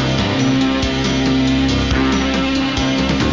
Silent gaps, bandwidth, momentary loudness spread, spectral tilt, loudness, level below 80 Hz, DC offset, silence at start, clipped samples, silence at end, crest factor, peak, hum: none; 7.6 kHz; 2 LU; -5 dB/octave; -16 LUFS; -26 dBFS; under 0.1%; 0 s; under 0.1%; 0 s; 8 dB; -8 dBFS; none